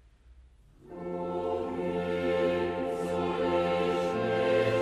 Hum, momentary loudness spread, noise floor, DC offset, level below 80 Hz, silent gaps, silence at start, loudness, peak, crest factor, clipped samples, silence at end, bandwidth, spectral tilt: none; 8 LU; -57 dBFS; under 0.1%; -58 dBFS; none; 0.3 s; -30 LUFS; -16 dBFS; 14 dB; under 0.1%; 0 s; 12.5 kHz; -6.5 dB/octave